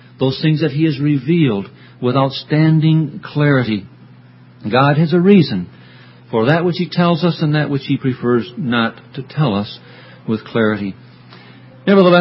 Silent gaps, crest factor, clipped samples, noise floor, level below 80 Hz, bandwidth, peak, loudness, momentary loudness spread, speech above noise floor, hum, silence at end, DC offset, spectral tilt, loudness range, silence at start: none; 16 dB; under 0.1%; -42 dBFS; -54 dBFS; 5.8 kHz; 0 dBFS; -16 LUFS; 12 LU; 28 dB; none; 0 s; under 0.1%; -10.5 dB/octave; 5 LU; 0.2 s